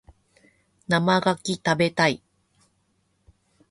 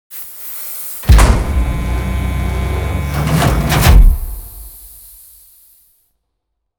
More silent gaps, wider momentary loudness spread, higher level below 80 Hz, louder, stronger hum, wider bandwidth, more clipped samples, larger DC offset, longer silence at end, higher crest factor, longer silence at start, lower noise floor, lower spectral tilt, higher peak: neither; second, 10 LU vs 22 LU; second, -60 dBFS vs -16 dBFS; second, -23 LUFS vs -15 LUFS; neither; second, 11.5 kHz vs over 20 kHz; second, under 0.1% vs 0.1%; neither; second, 1.55 s vs 1.9 s; first, 20 dB vs 14 dB; first, 0.9 s vs 0.1 s; about the same, -69 dBFS vs -72 dBFS; about the same, -5 dB/octave vs -5.5 dB/octave; second, -6 dBFS vs 0 dBFS